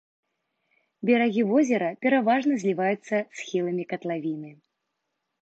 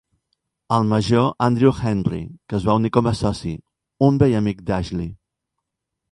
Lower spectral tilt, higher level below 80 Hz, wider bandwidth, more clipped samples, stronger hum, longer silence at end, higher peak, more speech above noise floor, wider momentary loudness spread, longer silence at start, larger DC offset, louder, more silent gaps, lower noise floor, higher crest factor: second, -6 dB/octave vs -7.5 dB/octave; second, -80 dBFS vs -42 dBFS; second, 8 kHz vs 11.5 kHz; neither; neither; about the same, 0.9 s vs 1 s; second, -8 dBFS vs -2 dBFS; second, 56 dB vs 62 dB; second, 9 LU vs 12 LU; first, 1 s vs 0.7 s; neither; second, -25 LUFS vs -20 LUFS; neither; about the same, -80 dBFS vs -81 dBFS; about the same, 18 dB vs 20 dB